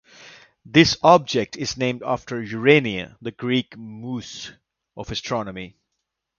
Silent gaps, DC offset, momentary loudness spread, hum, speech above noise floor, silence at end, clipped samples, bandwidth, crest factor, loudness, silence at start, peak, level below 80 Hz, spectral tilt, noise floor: none; under 0.1%; 20 LU; none; 58 dB; 0.7 s; under 0.1%; 7.2 kHz; 22 dB; -21 LUFS; 0.25 s; 0 dBFS; -52 dBFS; -5 dB/octave; -79 dBFS